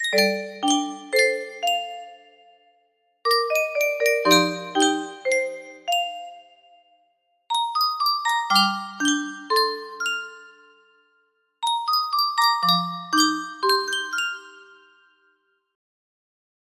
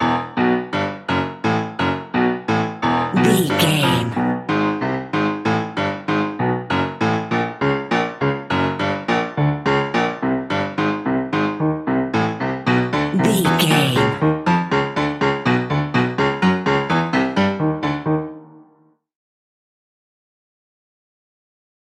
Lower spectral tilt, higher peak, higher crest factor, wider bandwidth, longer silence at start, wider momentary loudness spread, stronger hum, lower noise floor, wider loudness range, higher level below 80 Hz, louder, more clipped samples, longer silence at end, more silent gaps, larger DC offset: second, -2 dB/octave vs -5.5 dB/octave; about the same, -4 dBFS vs -2 dBFS; about the same, 22 dB vs 18 dB; about the same, 15.5 kHz vs 16 kHz; about the same, 0 s vs 0 s; first, 10 LU vs 6 LU; neither; first, -67 dBFS vs -56 dBFS; about the same, 4 LU vs 3 LU; second, -74 dBFS vs -50 dBFS; second, -22 LUFS vs -19 LUFS; neither; second, 2.1 s vs 3.3 s; neither; neither